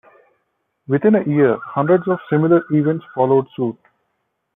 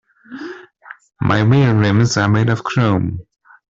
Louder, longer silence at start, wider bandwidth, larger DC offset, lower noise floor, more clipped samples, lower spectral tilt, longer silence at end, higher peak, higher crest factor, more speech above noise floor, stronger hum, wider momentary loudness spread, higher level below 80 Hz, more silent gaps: about the same, -17 LUFS vs -15 LUFS; first, 0.9 s vs 0.3 s; second, 3.9 kHz vs 7.8 kHz; neither; first, -72 dBFS vs -41 dBFS; neither; first, -12 dB/octave vs -6.5 dB/octave; first, 0.8 s vs 0.5 s; about the same, -4 dBFS vs -2 dBFS; about the same, 14 dB vs 14 dB; first, 55 dB vs 26 dB; neither; second, 7 LU vs 20 LU; second, -62 dBFS vs -46 dBFS; neither